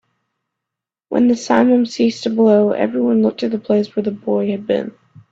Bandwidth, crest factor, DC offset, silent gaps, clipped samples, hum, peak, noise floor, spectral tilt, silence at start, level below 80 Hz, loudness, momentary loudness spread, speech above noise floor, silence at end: 7.8 kHz; 16 dB; under 0.1%; none; under 0.1%; none; 0 dBFS; -84 dBFS; -6.5 dB/octave; 1.1 s; -60 dBFS; -16 LUFS; 8 LU; 68 dB; 0.4 s